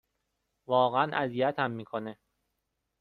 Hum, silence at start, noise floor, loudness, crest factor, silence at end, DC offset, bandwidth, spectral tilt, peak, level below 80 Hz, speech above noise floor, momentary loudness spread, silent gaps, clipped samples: none; 0.7 s; -82 dBFS; -29 LUFS; 20 dB; 0.9 s; under 0.1%; 4.7 kHz; -8 dB/octave; -12 dBFS; -72 dBFS; 53 dB; 12 LU; none; under 0.1%